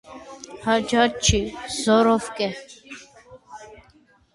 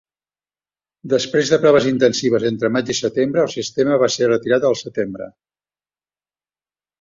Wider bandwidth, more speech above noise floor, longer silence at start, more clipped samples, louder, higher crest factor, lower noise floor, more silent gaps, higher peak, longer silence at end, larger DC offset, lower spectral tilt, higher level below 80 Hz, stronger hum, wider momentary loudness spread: first, 11.5 kHz vs 7.6 kHz; second, 36 dB vs over 73 dB; second, 0.1 s vs 1.05 s; neither; second, -21 LUFS vs -17 LUFS; about the same, 20 dB vs 18 dB; second, -57 dBFS vs under -90 dBFS; neither; about the same, -4 dBFS vs -2 dBFS; second, 0.6 s vs 1.7 s; neither; about the same, -4 dB/octave vs -4.5 dB/octave; first, -40 dBFS vs -60 dBFS; second, none vs 50 Hz at -55 dBFS; first, 23 LU vs 10 LU